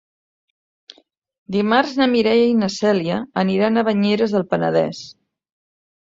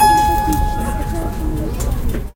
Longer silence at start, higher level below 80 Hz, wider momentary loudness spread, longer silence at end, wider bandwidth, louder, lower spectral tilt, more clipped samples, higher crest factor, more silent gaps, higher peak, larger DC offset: first, 1.5 s vs 0 s; second, -60 dBFS vs -22 dBFS; about the same, 8 LU vs 9 LU; first, 0.9 s vs 0.05 s; second, 7.8 kHz vs 17 kHz; about the same, -18 LUFS vs -19 LUFS; about the same, -6 dB/octave vs -5 dB/octave; neither; about the same, 16 dB vs 14 dB; neither; about the same, -2 dBFS vs -2 dBFS; neither